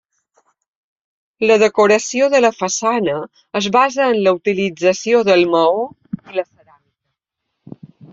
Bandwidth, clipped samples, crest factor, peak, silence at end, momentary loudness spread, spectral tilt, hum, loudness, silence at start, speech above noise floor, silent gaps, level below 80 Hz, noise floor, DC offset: 7.8 kHz; under 0.1%; 16 dB; -2 dBFS; 1.7 s; 12 LU; -4 dB/octave; none; -15 LUFS; 1.4 s; 62 dB; none; -62 dBFS; -76 dBFS; under 0.1%